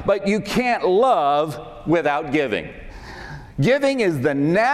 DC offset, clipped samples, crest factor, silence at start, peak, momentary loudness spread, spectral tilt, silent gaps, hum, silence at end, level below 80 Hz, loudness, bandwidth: under 0.1%; under 0.1%; 12 dB; 0 s; -6 dBFS; 19 LU; -6 dB/octave; none; none; 0 s; -46 dBFS; -20 LUFS; 15 kHz